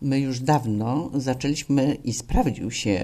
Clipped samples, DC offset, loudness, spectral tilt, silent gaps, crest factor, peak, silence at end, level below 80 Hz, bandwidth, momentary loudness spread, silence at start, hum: under 0.1%; under 0.1%; -24 LUFS; -5.5 dB/octave; none; 16 dB; -8 dBFS; 0 s; -36 dBFS; 14 kHz; 4 LU; 0 s; none